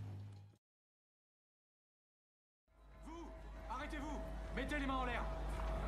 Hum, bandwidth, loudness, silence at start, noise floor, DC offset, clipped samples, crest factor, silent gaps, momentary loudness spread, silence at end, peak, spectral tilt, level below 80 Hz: none; 12.5 kHz; -45 LUFS; 0 s; under -90 dBFS; under 0.1%; under 0.1%; 18 dB; 0.58-2.67 s; 15 LU; 0 s; -28 dBFS; -6 dB/octave; -50 dBFS